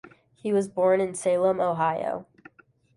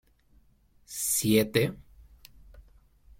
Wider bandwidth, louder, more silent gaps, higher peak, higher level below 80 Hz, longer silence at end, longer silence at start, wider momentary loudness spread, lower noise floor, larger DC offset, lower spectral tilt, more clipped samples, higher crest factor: second, 11.5 kHz vs 16.5 kHz; about the same, -25 LUFS vs -26 LUFS; neither; about the same, -12 dBFS vs -10 dBFS; second, -68 dBFS vs -56 dBFS; first, 0.75 s vs 0.6 s; second, 0.05 s vs 0.9 s; second, 10 LU vs 16 LU; second, -56 dBFS vs -62 dBFS; neither; first, -6 dB/octave vs -4 dB/octave; neither; second, 16 dB vs 22 dB